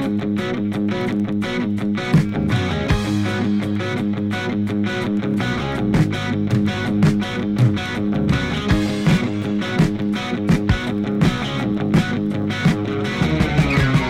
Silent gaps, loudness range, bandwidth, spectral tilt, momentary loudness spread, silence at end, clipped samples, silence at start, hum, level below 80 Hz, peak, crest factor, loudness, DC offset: none; 2 LU; 13.5 kHz; -7 dB/octave; 4 LU; 0 s; under 0.1%; 0 s; none; -34 dBFS; -4 dBFS; 16 dB; -20 LUFS; under 0.1%